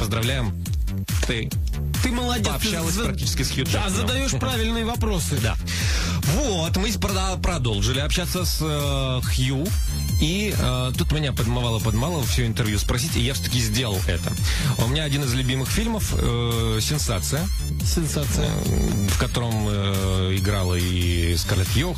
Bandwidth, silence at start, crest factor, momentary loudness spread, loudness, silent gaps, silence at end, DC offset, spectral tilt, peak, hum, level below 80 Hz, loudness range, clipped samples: 15.5 kHz; 0 s; 12 dB; 2 LU; -23 LUFS; none; 0 s; under 0.1%; -4.5 dB/octave; -10 dBFS; none; -28 dBFS; 1 LU; under 0.1%